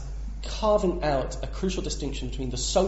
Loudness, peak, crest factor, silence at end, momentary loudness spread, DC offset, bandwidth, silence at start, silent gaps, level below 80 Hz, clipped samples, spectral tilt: -28 LUFS; -8 dBFS; 18 dB; 0 s; 11 LU; under 0.1%; 8 kHz; 0 s; none; -34 dBFS; under 0.1%; -5 dB/octave